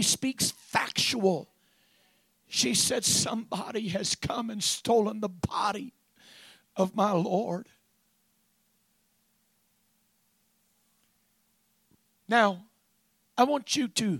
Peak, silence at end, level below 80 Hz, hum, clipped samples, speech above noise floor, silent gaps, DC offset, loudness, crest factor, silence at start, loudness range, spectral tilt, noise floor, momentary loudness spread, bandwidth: -8 dBFS; 0 s; -64 dBFS; none; under 0.1%; 44 dB; none; under 0.1%; -28 LUFS; 24 dB; 0 s; 6 LU; -3 dB/octave; -71 dBFS; 10 LU; 16.5 kHz